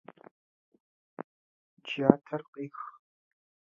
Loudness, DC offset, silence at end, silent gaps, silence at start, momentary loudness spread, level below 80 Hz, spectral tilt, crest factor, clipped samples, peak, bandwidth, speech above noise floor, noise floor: -30 LUFS; under 0.1%; 0.8 s; 1.24-1.77 s, 2.48-2.53 s; 1.2 s; 22 LU; -84 dBFS; -6 dB/octave; 32 dB; under 0.1%; -2 dBFS; 7.2 kHz; over 61 dB; under -90 dBFS